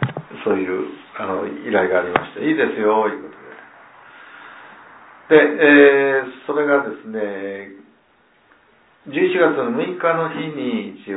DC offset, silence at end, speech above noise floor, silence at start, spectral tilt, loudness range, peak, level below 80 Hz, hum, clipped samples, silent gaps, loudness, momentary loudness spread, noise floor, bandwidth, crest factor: under 0.1%; 0 s; 39 dB; 0 s; -9.5 dB/octave; 7 LU; 0 dBFS; -64 dBFS; none; under 0.1%; none; -18 LUFS; 18 LU; -57 dBFS; 4 kHz; 18 dB